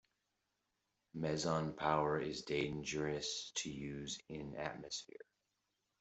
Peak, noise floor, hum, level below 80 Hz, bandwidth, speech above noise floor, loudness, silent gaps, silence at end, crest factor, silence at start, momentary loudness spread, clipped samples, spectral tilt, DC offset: -18 dBFS; -86 dBFS; none; -68 dBFS; 8.2 kHz; 46 dB; -41 LUFS; none; 0.95 s; 24 dB; 1.15 s; 10 LU; under 0.1%; -4 dB/octave; under 0.1%